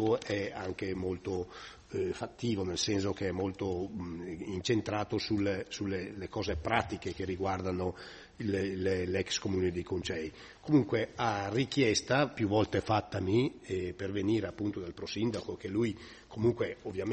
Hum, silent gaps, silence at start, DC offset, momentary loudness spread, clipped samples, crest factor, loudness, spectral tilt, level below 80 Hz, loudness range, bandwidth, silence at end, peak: none; none; 0 s; under 0.1%; 10 LU; under 0.1%; 22 dB; -33 LUFS; -5.5 dB/octave; -58 dBFS; 4 LU; 8.4 kHz; 0 s; -12 dBFS